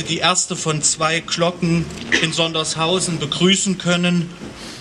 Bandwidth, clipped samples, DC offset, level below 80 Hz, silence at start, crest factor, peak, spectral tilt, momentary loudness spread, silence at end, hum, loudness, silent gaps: 11.5 kHz; under 0.1%; under 0.1%; -48 dBFS; 0 s; 20 dB; 0 dBFS; -3 dB/octave; 6 LU; 0 s; none; -18 LUFS; none